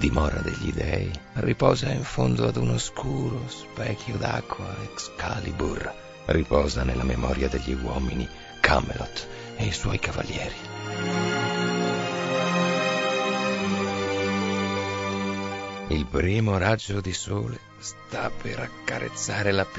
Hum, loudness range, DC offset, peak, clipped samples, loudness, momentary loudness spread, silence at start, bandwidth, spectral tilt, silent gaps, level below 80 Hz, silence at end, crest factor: none; 3 LU; under 0.1%; 0 dBFS; under 0.1%; -27 LUFS; 10 LU; 0 s; 8 kHz; -5 dB/octave; none; -36 dBFS; 0 s; 26 dB